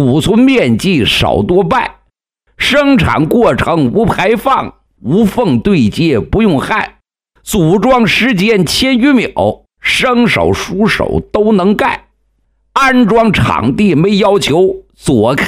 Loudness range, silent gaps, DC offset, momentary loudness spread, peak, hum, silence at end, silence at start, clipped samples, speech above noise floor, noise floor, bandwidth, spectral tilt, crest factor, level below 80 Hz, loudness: 2 LU; none; under 0.1%; 7 LU; 0 dBFS; none; 0 s; 0 s; under 0.1%; 50 dB; -59 dBFS; 16 kHz; -5.5 dB/octave; 10 dB; -32 dBFS; -10 LUFS